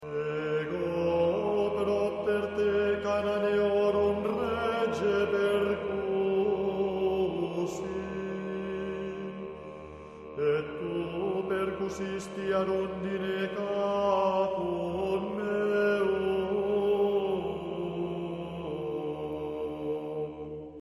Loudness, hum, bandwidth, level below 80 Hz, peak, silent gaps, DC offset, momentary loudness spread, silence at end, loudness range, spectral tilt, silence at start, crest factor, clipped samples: -30 LUFS; none; 12 kHz; -56 dBFS; -14 dBFS; none; under 0.1%; 9 LU; 0 s; 7 LU; -6.5 dB/octave; 0 s; 14 dB; under 0.1%